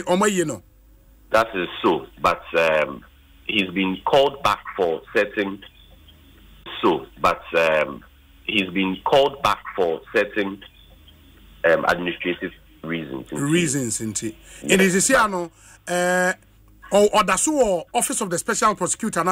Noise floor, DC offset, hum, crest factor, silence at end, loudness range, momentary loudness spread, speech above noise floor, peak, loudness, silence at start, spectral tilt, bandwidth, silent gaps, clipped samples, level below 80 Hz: -51 dBFS; under 0.1%; none; 16 dB; 0 s; 4 LU; 12 LU; 30 dB; -6 dBFS; -21 LUFS; 0 s; -3.5 dB/octave; 16 kHz; none; under 0.1%; -50 dBFS